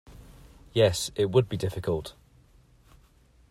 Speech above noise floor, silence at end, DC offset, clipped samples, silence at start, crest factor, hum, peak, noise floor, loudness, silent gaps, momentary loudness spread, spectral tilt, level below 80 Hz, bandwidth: 34 dB; 1.4 s; under 0.1%; under 0.1%; 0.1 s; 20 dB; none; -8 dBFS; -59 dBFS; -27 LUFS; none; 9 LU; -5.5 dB/octave; -52 dBFS; 16 kHz